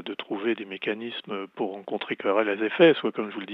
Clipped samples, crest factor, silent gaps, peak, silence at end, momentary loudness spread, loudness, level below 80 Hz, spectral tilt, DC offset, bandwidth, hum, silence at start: under 0.1%; 20 dB; none; -6 dBFS; 0 s; 14 LU; -26 LUFS; under -90 dBFS; -8 dB/octave; under 0.1%; 5 kHz; none; 0 s